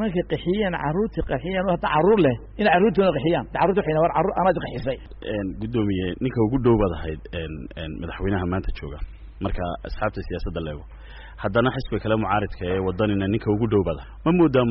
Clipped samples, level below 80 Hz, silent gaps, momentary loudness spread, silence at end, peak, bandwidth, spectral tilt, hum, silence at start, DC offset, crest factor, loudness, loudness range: under 0.1%; -36 dBFS; none; 14 LU; 0 s; -8 dBFS; 5.8 kHz; -6 dB/octave; none; 0 s; under 0.1%; 14 dB; -23 LUFS; 9 LU